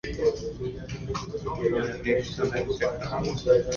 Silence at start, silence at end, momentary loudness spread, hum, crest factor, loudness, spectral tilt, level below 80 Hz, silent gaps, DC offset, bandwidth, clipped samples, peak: 0.05 s; 0 s; 9 LU; none; 18 dB; -28 LUFS; -5.5 dB/octave; -44 dBFS; none; under 0.1%; 7.2 kHz; under 0.1%; -10 dBFS